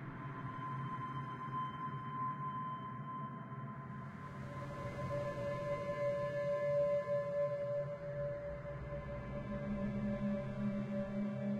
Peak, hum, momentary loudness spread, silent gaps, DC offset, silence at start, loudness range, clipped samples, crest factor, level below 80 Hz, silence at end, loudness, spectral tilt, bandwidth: -26 dBFS; none; 9 LU; none; under 0.1%; 0 s; 6 LU; under 0.1%; 14 dB; -60 dBFS; 0 s; -41 LUFS; -8.5 dB/octave; 9.2 kHz